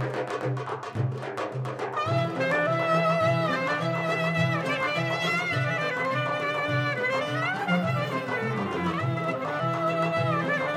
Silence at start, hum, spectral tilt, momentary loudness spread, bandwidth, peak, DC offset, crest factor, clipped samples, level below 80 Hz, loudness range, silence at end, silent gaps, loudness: 0 s; none; -6 dB/octave; 7 LU; 13.5 kHz; -12 dBFS; under 0.1%; 14 dB; under 0.1%; -68 dBFS; 2 LU; 0 s; none; -27 LUFS